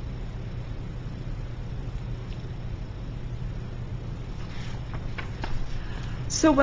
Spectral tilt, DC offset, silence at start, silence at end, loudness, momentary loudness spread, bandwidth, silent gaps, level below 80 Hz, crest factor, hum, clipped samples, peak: -5.5 dB/octave; under 0.1%; 0 s; 0 s; -34 LUFS; 2 LU; 7.8 kHz; none; -36 dBFS; 24 dB; none; under 0.1%; -6 dBFS